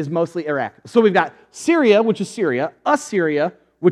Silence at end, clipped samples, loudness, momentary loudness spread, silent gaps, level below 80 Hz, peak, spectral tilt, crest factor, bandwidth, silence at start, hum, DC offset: 0 s; under 0.1%; -19 LUFS; 9 LU; none; -74 dBFS; 0 dBFS; -5.5 dB/octave; 18 dB; 12.5 kHz; 0 s; none; under 0.1%